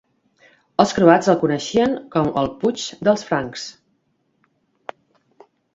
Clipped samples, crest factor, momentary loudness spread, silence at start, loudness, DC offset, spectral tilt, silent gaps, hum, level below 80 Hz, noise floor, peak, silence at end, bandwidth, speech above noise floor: under 0.1%; 20 dB; 22 LU; 0.8 s; -19 LUFS; under 0.1%; -5.5 dB/octave; none; none; -54 dBFS; -67 dBFS; 0 dBFS; 2.05 s; 7.8 kHz; 49 dB